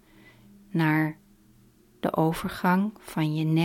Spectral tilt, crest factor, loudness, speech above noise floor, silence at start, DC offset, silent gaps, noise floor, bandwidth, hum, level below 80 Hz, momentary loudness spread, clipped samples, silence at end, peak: -7 dB/octave; 18 dB; -27 LUFS; 33 dB; 0.75 s; under 0.1%; none; -58 dBFS; 16.5 kHz; none; -58 dBFS; 8 LU; under 0.1%; 0 s; -10 dBFS